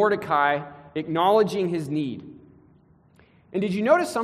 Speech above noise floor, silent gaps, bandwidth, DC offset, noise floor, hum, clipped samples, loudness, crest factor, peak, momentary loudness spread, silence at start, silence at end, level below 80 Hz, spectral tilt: 34 dB; none; 14 kHz; under 0.1%; -57 dBFS; none; under 0.1%; -24 LUFS; 18 dB; -6 dBFS; 13 LU; 0 s; 0 s; -66 dBFS; -6 dB/octave